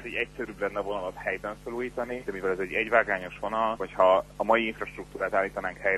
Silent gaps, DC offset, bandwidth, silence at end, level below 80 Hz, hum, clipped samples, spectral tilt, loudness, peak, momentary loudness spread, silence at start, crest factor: none; under 0.1%; 13 kHz; 0 s; -52 dBFS; none; under 0.1%; -5.5 dB/octave; -28 LUFS; -6 dBFS; 10 LU; 0 s; 22 dB